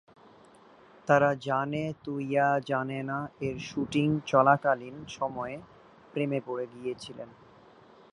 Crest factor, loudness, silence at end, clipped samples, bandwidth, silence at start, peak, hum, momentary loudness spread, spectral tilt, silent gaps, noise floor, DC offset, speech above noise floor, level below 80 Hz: 22 dB; -29 LUFS; 0.85 s; under 0.1%; 11 kHz; 1.05 s; -8 dBFS; none; 16 LU; -6.5 dB/octave; none; -56 dBFS; under 0.1%; 27 dB; -64 dBFS